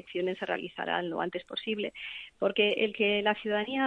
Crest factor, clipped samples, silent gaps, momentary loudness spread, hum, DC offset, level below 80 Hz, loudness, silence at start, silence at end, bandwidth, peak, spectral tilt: 18 dB; under 0.1%; none; 9 LU; none; under 0.1%; -70 dBFS; -30 LUFS; 0.05 s; 0 s; 8.4 kHz; -12 dBFS; -6 dB/octave